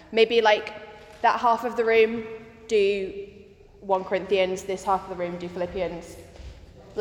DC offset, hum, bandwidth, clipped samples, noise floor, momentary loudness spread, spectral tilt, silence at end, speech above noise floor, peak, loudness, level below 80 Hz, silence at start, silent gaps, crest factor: under 0.1%; none; 14.5 kHz; under 0.1%; -49 dBFS; 22 LU; -4.5 dB/octave; 0 s; 26 dB; -6 dBFS; -24 LUFS; -52 dBFS; 0.1 s; none; 20 dB